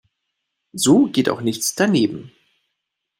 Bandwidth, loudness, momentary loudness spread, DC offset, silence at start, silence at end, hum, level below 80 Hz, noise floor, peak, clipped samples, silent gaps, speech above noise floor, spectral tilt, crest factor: 16 kHz; -18 LUFS; 12 LU; under 0.1%; 0.75 s; 0.9 s; none; -62 dBFS; -78 dBFS; -2 dBFS; under 0.1%; none; 61 dB; -4.5 dB/octave; 18 dB